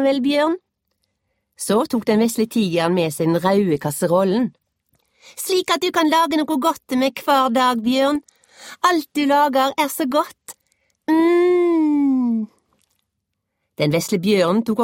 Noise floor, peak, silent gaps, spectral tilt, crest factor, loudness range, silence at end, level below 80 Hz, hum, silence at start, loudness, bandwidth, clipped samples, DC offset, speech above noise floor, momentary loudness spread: -77 dBFS; -2 dBFS; none; -5 dB/octave; 16 dB; 2 LU; 0 s; -62 dBFS; none; 0 s; -18 LUFS; 16.5 kHz; under 0.1%; under 0.1%; 59 dB; 7 LU